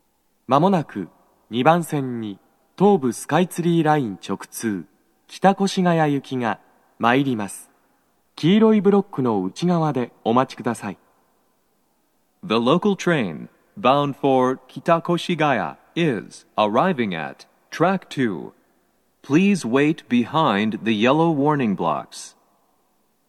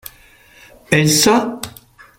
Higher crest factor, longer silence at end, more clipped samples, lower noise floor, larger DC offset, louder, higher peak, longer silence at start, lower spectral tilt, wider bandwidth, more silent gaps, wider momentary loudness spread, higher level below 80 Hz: about the same, 20 dB vs 18 dB; first, 1 s vs 0.5 s; neither; first, -66 dBFS vs -47 dBFS; neither; second, -21 LUFS vs -14 LUFS; about the same, -2 dBFS vs 0 dBFS; second, 0.5 s vs 0.9 s; first, -6 dB/octave vs -3.5 dB/octave; second, 13 kHz vs 16.5 kHz; neither; second, 14 LU vs 19 LU; second, -70 dBFS vs -50 dBFS